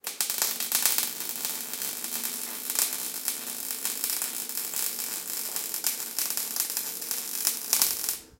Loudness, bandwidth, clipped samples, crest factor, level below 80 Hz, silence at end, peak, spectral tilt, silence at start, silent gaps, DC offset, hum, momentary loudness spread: -27 LUFS; 17.5 kHz; under 0.1%; 30 dB; -74 dBFS; 0.05 s; 0 dBFS; 1.5 dB/octave; 0.05 s; none; under 0.1%; none; 7 LU